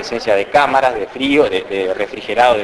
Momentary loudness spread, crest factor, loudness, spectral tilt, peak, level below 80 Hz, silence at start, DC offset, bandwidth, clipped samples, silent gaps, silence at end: 7 LU; 14 dB; -15 LUFS; -4 dB/octave; 0 dBFS; -46 dBFS; 0 s; under 0.1%; 11 kHz; under 0.1%; none; 0 s